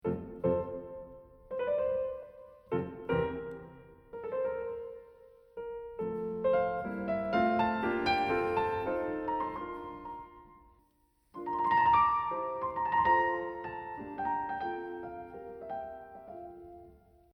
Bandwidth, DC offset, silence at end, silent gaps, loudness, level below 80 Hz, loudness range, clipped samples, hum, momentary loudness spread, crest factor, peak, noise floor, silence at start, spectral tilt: 8 kHz; under 0.1%; 0.4 s; none; -33 LUFS; -60 dBFS; 8 LU; under 0.1%; none; 19 LU; 18 dB; -14 dBFS; -71 dBFS; 0.05 s; -7.5 dB/octave